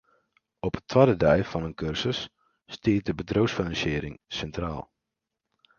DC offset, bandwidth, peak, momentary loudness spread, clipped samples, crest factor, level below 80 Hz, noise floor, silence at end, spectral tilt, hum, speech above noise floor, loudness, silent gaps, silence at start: under 0.1%; 7.2 kHz; -4 dBFS; 13 LU; under 0.1%; 24 dB; -46 dBFS; -85 dBFS; 0.95 s; -6.5 dB/octave; none; 59 dB; -27 LUFS; none; 0.65 s